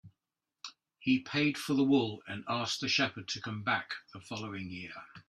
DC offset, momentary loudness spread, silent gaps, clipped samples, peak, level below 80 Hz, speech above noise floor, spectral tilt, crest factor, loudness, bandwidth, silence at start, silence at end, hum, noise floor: under 0.1%; 16 LU; none; under 0.1%; -16 dBFS; -72 dBFS; 56 dB; -4.5 dB/octave; 18 dB; -33 LUFS; 14 kHz; 0.05 s; 0.1 s; none; -89 dBFS